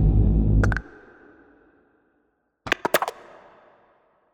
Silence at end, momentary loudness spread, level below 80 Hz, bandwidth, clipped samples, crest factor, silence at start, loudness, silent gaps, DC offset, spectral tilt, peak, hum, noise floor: 1.25 s; 22 LU; -28 dBFS; 16 kHz; under 0.1%; 20 dB; 0 s; -23 LUFS; none; under 0.1%; -6 dB/octave; -6 dBFS; none; -70 dBFS